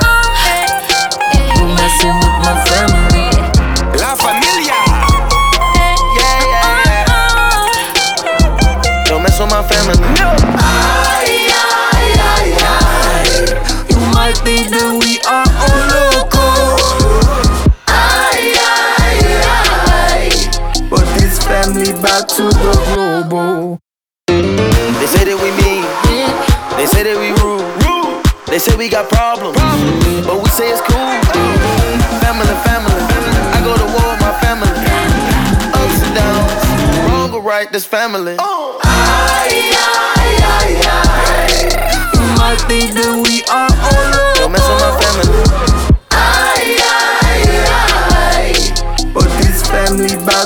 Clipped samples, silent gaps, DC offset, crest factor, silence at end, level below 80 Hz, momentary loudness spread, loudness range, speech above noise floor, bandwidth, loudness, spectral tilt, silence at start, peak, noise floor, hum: under 0.1%; none; 0.2%; 10 dB; 0 s; -16 dBFS; 4 LU; 3 LU; 50 dB; over 20 kHz; -11 LUFS; -4 dB/octave; 0 s; 0 dBFS; -63 dBFS; none